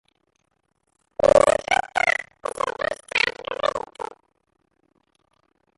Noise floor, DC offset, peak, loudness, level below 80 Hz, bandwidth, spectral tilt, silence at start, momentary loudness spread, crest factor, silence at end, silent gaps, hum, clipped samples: -72 dBFS; under 0.1%; -4 dBFS; -22 LUFS; -54 dBFS; 11.5 kHz; -2.5 dB/octave; 1.25 s; 18 LU; 22 dB; 1.75 s; none; none; under 0.1%